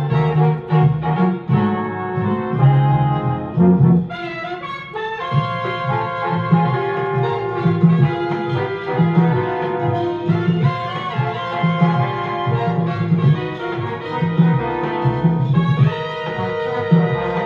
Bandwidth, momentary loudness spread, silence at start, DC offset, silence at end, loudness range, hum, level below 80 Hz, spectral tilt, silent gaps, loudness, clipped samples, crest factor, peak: 5.4 kHz; 8 LU; 0 s; under 0.1%; 0 s; 2 LU; none; -48 dBFS; -9.5 dB/octave; none; -18 LUFS; under 0.1%; 16 dB; -2 dBFS